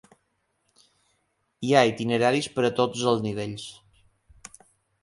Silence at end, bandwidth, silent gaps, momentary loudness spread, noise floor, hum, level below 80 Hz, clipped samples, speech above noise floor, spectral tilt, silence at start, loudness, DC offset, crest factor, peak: 1.3 s; 11.5 kHz; none; 23 LU; -73 dBFS; none; -64 dBFS; under 0.1%; 50 dB; -5 dB/octave; 1.6 s; -24 LUFS; under 0.1%; 22 dB; -6 dBFS